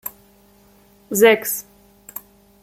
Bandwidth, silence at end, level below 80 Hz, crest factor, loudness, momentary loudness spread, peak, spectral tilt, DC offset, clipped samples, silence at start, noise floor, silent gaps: 16.5 kHz; 1 s; -62 dBFS; 20 dB; -17 LUFS; 22 LU; -2 dBFS; -3 dB/octave; under 0.1%; under 0.1%; 0.05 s; -53 dBFS; none